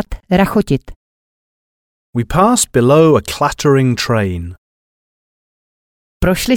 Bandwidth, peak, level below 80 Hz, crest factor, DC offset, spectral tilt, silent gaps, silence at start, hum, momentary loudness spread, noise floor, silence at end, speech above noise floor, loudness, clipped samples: 19 kHz; 0 dBFS; -32 dBFS; 14 dB; under 0.1%; -5.5 dB/octave; 0.96-2.13 s, 4.58-6.20 s; 0 s; none; 11 LU; under -90 dBFS; 0 s; over 77 dB; -14 LUFS; under 0.1%